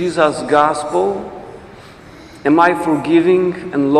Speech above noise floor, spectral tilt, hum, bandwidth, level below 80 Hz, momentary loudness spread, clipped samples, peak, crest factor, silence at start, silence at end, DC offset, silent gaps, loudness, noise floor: 24 dB; -6 dB/octave; none; 11.5 kHz; -50 dBFS; 14 LU; under 0.1%; 0 dBFS; 16 dB; 0 s; 0 s; under 0.1%; none; -15 LUFS; -38 dBFS